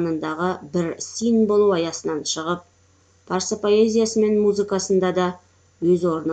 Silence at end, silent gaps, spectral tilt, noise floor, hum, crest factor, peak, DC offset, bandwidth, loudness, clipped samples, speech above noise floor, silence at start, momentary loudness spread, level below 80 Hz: 0 s; none; -5 dB/octave; -57 dBFS; none; 14 dB; -6 dBFS; under 0.1%; 9.2 kHz; -21 LUFS; under 0.1%; 37 dB; 0 s; 8 LU; -62 dBFS